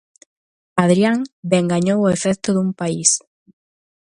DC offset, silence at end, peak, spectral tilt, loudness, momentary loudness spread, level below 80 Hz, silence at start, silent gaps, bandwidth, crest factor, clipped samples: under 0.1%; 0.85 s; 0 dBFS; -4.5 dB/octave; -18 LUFS; 7 LU; -58 dBFS; 0.75 s; 1.33-1.43 s; 11.5 kHz; 20 dB; under 0.1%